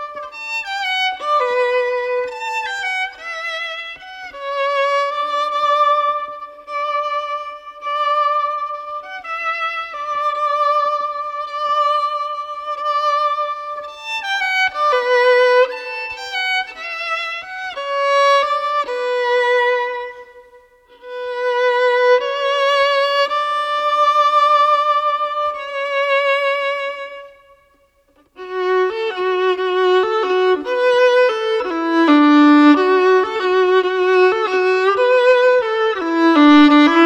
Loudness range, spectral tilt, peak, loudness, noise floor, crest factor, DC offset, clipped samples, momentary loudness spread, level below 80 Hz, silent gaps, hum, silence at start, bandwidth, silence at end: 8 LU; -2.5 dB/octave; -2 dBFS; -16 LUFS; -57 dBFS; 16 dB; under 0.1%; under 0.1%; 13 LU; -60 dBFS; none; none; 0 s; 9.2 kHz; 0 s